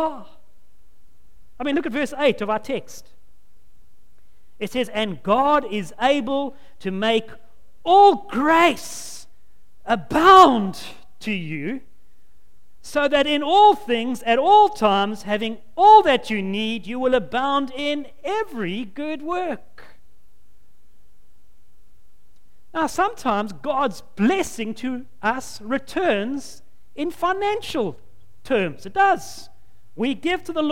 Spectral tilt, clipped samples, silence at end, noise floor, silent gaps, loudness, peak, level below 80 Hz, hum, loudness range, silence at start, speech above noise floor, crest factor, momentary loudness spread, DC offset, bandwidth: -4.5 dB/octave; under 0.1%; 0 s; -59 dBFS; none; -20 LUFS; 0 dBFS; -52 dBFS; none; 11 LU; 0 s; 39 dB; 22 dB; 16 LU; 2%; 16.5 kHz